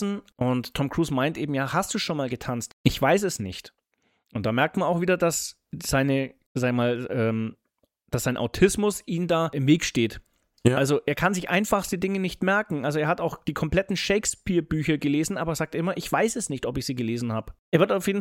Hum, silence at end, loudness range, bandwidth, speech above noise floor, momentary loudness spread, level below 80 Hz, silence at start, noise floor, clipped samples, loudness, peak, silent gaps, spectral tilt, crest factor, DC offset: none; 0 s; 2 LU; 17 kHz; 47 dB; 8 LU; -48 dBFS; 0 s; -72 dBFS; under 0.1%; -25 LUFS; -4 dBFS; 2.73-2.84 s, 6.46-6.55 s, 17.59-17.72 s; -5 dB/octave; 22 dB; under 0.1%